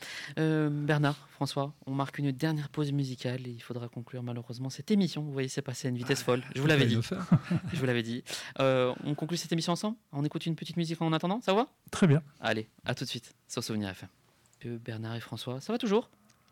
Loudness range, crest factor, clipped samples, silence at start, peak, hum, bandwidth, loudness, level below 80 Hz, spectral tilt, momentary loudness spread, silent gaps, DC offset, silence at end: 6 LU; 16 dB; under 0.1%; 0 s; -14 dBFS; none; 16.5 kHz; -32 LUFS; -68 dBFS; -6 dB/octave; 12 LU; none; under 0.1%; 0.45 s